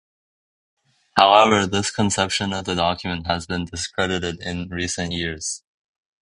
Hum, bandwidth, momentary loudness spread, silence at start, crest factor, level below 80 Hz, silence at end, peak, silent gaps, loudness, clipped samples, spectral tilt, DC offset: none; 11 kHz; 13 LU; 1.15 s; 22 dB; -44 dBFS; 0.75 s; 0 dBFS; none; -21 LUFS; under 0.1%; -3.5 dB/octave; under 0.1%